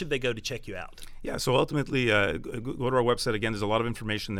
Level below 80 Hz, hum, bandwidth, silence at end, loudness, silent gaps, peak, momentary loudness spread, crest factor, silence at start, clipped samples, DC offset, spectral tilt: -46 dBFS; none; 16 kHz; 0 s; -28 LUFS; none; -10 dBFS; 13 LU; 18 dB; 0 s; under 0.1%; under 0.1%; -5 dB/octave